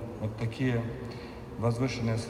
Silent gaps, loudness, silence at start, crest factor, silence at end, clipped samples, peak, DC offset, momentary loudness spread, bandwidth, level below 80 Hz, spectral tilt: none; -33 LUFS; 0 s; 14 dB; 0 s; under 0.1%; -18 dBFS; under 0.1%; 11 LU; 11.5 kHz; -52 dBFS; -7 dB/octave